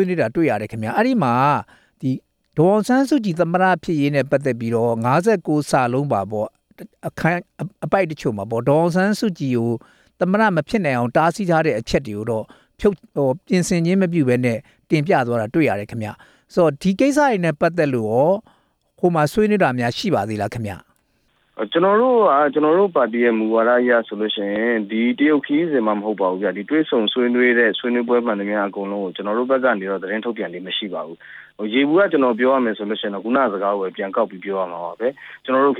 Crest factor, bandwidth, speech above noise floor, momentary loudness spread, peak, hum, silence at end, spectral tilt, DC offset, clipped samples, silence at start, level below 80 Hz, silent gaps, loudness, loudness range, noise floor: 16 dB; 15 kHz; 45 dB; 9 LU; -2 dBFS; none; 0 s; -6.5 dB/octave; under 0.1%; under 0.1%; 0 s; -52 dBFS; none; -19 LUFS; 4 LU; -63 dBFS